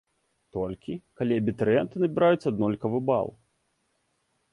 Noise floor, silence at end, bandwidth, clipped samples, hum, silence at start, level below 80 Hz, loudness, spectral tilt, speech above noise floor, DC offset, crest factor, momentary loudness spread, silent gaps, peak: -74 dBFS; 1.2 s; 11 kHz; under 0.1%; none; 0.55 s; -58 dBFS; -26 LUFS; -8.5 dB/octave; 48 dB; under 0.1%; 18 dB; 13 LU; none; -10 dBFS